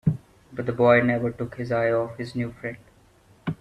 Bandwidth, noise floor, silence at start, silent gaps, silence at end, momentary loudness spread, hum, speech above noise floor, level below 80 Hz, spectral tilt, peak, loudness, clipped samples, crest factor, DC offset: 11 kHz; -56 dBFS; 0.05 s; none; 0.05 s; 17 LU; none; 33 dB; -54 dBFS; -8.5 dB/octave; -6 dBFS; -24 LUFS; under 0.1%; 20 dB; under 0.1%